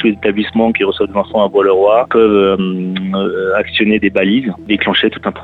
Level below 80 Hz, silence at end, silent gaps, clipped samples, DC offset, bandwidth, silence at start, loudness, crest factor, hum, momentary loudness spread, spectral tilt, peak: -44 dBFS; 0 s; none; under 0.1%; under 0.1%; 4.5 kHz; 0 s; -13 LUFS; 12 dB; none; 7 LU; -8 dB/octave; 0 dBFS